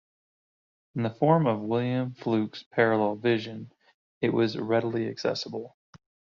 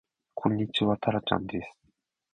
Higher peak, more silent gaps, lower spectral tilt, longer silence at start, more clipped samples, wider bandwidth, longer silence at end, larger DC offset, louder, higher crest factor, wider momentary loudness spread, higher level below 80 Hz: about the same, -8 dBFS vs -8 dBFS; first, 2.66-2.71 s, 3.94-4.21 s vs none; second, -5.5 dB/octave vs -7.5 dB/octave; first, 0.95 s vs 0.35 s; neither; second, 7.2 kHz vs 9.2 kHz; about the same, 0.65 s vs 0.6 s; neither; about the same, -27 LUFS vs -29 LUFS; about the same, 20 dB vs 22 dB; about the same, 14 LU vs 13 LU; second, -70 dBFS vs -56 dBFS